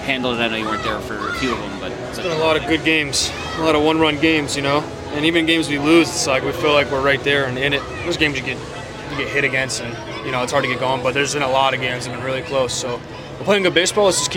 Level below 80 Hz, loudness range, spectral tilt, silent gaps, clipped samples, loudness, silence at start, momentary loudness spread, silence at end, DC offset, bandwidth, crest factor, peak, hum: -42 dBFS; 4 LU; -3.5 dB/octave; none; under 0.1%; -18 LUFS; 0 s; 11 LU; 0 s; under 0.1%; 17 kHz; 16 dB; -2 dBFS; none